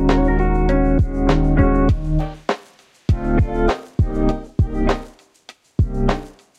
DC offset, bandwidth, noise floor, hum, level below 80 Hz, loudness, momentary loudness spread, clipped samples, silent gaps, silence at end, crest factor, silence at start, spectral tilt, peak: under 0.1%; 8 kHz; -49 dBFS; none; -22 dBFS; -20 LUFS; 10 LU; under 0.1%; none; 0.3 s; 16 dB; 0 s; -8 dB/octave; -2 dBFS